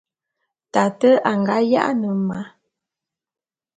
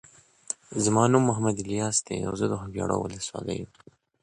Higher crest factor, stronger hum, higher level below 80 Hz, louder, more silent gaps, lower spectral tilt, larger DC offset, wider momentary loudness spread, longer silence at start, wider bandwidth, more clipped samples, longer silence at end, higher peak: about the same, 20 dB vs 20 dB; neither; second, -66 dBFS vs -54 dBFS; first, -19 LUFS vs -27 LUFS; neither; first, -6.5 dB/octave vs -5 dB/octave; neither; second, 10 LU vs 14 LU; first, 0.75 s vs 0.5 s; second, 9.2 kHz vs 11.5 kHz; neither; first, 1.3 s vs 0.55 s; first, -2 dBFS vs -6 dBFS